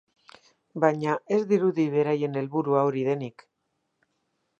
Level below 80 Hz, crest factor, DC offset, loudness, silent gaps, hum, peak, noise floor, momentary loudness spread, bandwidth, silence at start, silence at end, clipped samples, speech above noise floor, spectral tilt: -78 dBFS; 22 dB; under 0.1%; -25 LUFS; none; none; -6 dBFS; -77 dBFS; 6 LU; 7.6 kHz; 0.75 s; 1.3 s; under 0.1%; 53 dB; -8 dB/octave